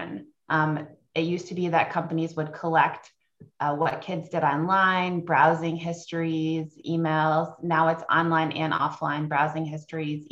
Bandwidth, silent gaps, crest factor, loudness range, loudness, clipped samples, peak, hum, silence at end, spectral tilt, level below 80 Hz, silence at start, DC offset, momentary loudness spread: 8 kHz; none; 20 dB; 3 LU; -25 LUFS; under 0.1%; -6 dBFS; none; 0.05 s; -6.5 dB/octave; -68 dBFS; 0 s; under 0.1%; 11 LU